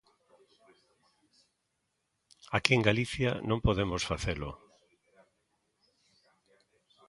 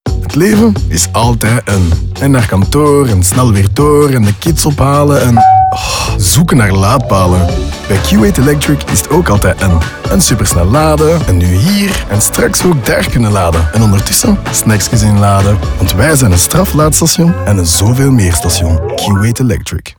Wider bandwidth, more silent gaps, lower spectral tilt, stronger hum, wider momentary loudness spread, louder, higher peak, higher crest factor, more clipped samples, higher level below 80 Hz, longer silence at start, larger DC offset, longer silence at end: second, 11.5 kHz vs over 20 kHz; neither; about the same, -5 dB/octave vs -5 dB/octave; neither; first, 13 LU vs 4 LU; second, -30 LUFS vs -9 LUFS; second, -4 dBFS vs 0 dBFS; first, 32 dB vs 8 dB; neither; second, -50 dBFS vs -22 dBFS; first, 2.5 s vs 0.05 s; second, under 0.1% vs 0.2%; first, 2.5 s vs 0.05 s